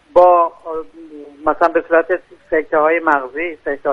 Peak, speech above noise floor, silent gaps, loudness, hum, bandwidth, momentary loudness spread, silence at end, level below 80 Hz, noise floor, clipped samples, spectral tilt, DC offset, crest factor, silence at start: 0 dBFS; 20 dB; none; -16 LUFS; none; 5.8 kHz; 16 LU; 0 s; -50 dBFS; -36 dBFS; under 0.1%; -6.5 dB/octave; under 0.1%; 16 dB; 0.15 s